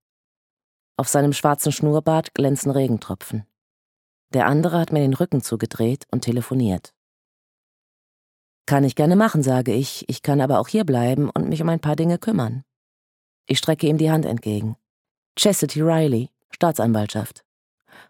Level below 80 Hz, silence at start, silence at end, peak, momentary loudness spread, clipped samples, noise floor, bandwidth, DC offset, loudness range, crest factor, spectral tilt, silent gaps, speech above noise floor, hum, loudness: -60 dBFS; 1 s; 0.8 s; -2 dBFS; 10 LU; under 0.1%; under -90 dBFS; 17.5 kHz; under 0.1%; 4 LU; 20 dB; -6 dB/octave; 3.61-4.28 s, 6.97-8.65 s, 12.76-13.44 s, 14.90-15.05 s, 15.11-15.35 s, 16.44-16.49 s; over 70 dB; none; -21 LUFS